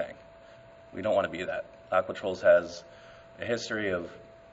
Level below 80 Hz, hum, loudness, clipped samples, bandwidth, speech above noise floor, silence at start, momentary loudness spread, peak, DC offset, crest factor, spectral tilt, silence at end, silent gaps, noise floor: -64 dBFS; none; -29 LUFS; under 0.1%; 8 kHz; 23 dB; 0 s; 21 LU; -10 dBFS; under 0.1%; 20 dB; -4.5 dB/octave; 0.15 s; none; -52 dBFS